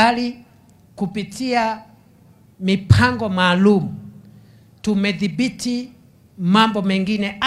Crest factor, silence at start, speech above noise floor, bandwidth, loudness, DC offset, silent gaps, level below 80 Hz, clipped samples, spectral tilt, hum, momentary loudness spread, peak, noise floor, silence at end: 20 dB; 0 s; 32 dB; 12.5 kHz; -19 LUFS; under 0.1%; none; -44 dBFS; under 0.1%; -6 dB/octave; none; 13 LU; 0 dBFS; -50 dBFS; 0 s